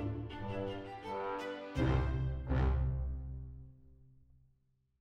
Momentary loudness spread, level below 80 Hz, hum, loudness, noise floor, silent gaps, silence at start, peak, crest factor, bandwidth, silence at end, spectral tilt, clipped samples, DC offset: 13 LU; -40 dBFS; none; -38 LUFS; -75 dBFS; none; 0 s; -20 dBFS; 18 dB; 6.6 kHz; 0.95 s; -8 dB/octave; under 0.1%; under 0.1%